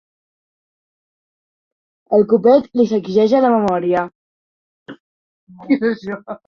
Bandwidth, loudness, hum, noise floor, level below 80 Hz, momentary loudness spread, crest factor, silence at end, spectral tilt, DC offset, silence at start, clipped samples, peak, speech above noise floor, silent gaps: 7 kHz; -16 LUFS; none; under -90 dBFS; -60 dBFS; 9 LU; 16 dB; 0.1 s; -7.5 dB/octave; under 0.1%; 2.1 s; under 0.1%; -2 dBFS; over 75 dB; 4.15-4.86 s, 5.00-5.47 s